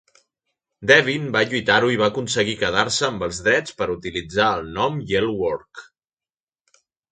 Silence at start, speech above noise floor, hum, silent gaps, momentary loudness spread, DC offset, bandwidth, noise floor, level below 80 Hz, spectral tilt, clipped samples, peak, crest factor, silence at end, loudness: 0.8 s; over 69 dB; none; none; 11 LU; under 0.1%; 9.4 kHz; under -90 dBFS; -50 dBFS; -3.5 dB/octave; under 0.1%; 0 dBFS; 22 dB; 1.3 s; -20 LUFS